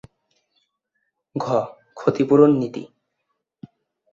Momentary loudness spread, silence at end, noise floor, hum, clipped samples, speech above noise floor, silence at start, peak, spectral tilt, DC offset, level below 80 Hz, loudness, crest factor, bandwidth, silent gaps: 19 LU; 1.25 s; -76 dBFS; none; under 0.1%; 58 dB; 1.35 s; -2 dBFS; -8.5 dB/octave; under 0.1%; -64 dBFS; -19 LUFS; 20 dB; 7.4 kHz; none